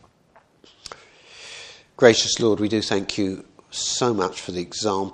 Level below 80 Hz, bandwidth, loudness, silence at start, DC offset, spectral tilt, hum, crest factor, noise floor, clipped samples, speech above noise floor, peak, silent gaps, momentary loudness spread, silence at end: -58 dBFS; 10.5 kHz; -21 LUFS; 1.35 s; under 0.1%; -3.5 dB/octave; none; 24 dB; -57 dBFS; under 0.1%; 36 dB; 0 dBFS; none; 24 LU; 0 s